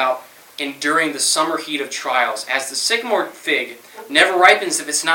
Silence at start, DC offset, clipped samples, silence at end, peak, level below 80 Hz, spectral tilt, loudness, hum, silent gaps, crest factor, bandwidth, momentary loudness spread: 0 s; under 0.1%; under 0.1%; 0 s; 0 dBFS; -72 dBFS; -0.5 dB/octave; -17 LUFS; none; none; 18 dB; 17.5 kHz; 15 LU